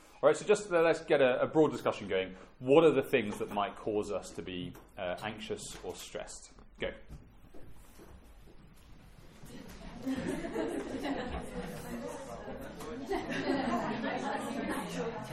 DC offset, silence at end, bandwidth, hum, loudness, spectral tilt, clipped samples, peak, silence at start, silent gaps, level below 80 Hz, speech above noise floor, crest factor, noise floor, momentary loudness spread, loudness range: under 0.1%; 0 s; 16 kHz; none; -33 LUFS; -5 dB/octave; under 0.1%; -10 dBFS; 0.1 s; none; -56 dBFS; 23 dB; 24 dB; -54 dBFS; 17 LU; 18 LU